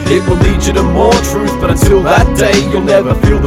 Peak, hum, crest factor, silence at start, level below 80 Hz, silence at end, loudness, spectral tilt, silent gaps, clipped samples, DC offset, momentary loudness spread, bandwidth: 0 dBFS; none; 10 dB; 0 s; -16 dBFS; 0 s; -10 LUFS; -5.5 dB/octave; none; under 0.1%; under 0.1%; 3 LU; 16.5 kHz